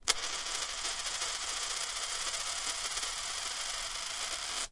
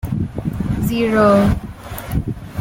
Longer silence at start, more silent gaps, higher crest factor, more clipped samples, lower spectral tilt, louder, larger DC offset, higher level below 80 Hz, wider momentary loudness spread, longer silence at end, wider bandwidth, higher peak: about the same, 0 s vs 0.05 s; neither; first, 28 dB vs 16 dB; neither; second, 2 dB/octave vs -7.5 dB/octave; second, -34 LUFS vs -18 LUFS; neither; second, -56 dBFS vs -30 dBFS; second, 2 LU vs 13 LU; about the same, 0 s vs 0 s; second, 11.5 kHz vs 17 kHz; second, -10 dBFS vs -2 dBFS